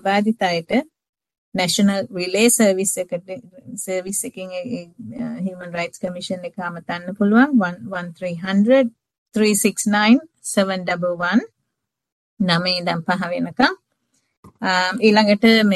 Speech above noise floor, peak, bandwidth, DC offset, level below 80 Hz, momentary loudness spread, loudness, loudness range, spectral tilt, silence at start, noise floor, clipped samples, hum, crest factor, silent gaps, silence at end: 60 dB; -2 dBFS; 12.5 kHz; under 0.1%; -62 dBFS; 14 LU; -19 LUFS; 9 LU; -4 dB/octave; 0.05 s; -79 dBFS; under 0.1%; none; 18 dB; 1.09-1.13 s, 1.38-1.52 s, 9.18-9.26 s, 12.12-12.37 s, 14.37-14.43 s; 0 s